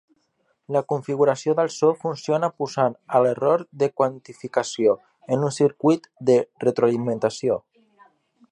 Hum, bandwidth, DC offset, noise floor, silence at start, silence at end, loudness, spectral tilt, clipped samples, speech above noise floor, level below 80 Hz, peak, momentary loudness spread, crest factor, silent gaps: none; 10.5 kHz; under 0.1%; -69 dBFS; 0.7 s; 0.9 s; -22 LUFS; -6 dB/octave; under 0.1%; 48 dB; -70 dBFS; -4 dBFS; 6 LU; 18 dB; none